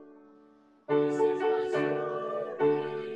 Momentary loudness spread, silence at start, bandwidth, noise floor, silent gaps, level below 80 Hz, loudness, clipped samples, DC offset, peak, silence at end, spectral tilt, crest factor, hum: 6 LU; 0 s; 8.4 kHz; -60 dBFS; none; -76 dBFS; -29 LUFS; under 0.1%; under 0.1%; -16 dBFS; 0 s; -7 dB/octave; 14 dB; none